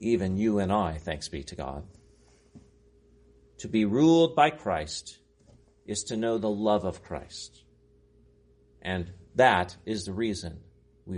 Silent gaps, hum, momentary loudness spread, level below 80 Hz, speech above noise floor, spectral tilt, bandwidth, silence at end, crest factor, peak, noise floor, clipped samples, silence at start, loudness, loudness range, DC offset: none; none; 18 LU; -52 dBFS; 34 dB; -5.5 dB/octave; 10.5 kHz; 0 s; 22 dB; -8 dBFS; -61 dBFS; under 0.1%; 0 s; -27 LUFS; 6 LU; under 0.1%